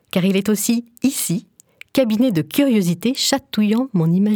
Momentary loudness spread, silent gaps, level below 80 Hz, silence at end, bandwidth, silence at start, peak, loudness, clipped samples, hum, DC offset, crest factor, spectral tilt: 5 LU; none; -60 dBFS; 0 s; over 20 kHz; 0.15 s; -2 dBFS; -18 LUFS; under 0.1%; none; under 0.1%; 16 dB; -5 dB/octave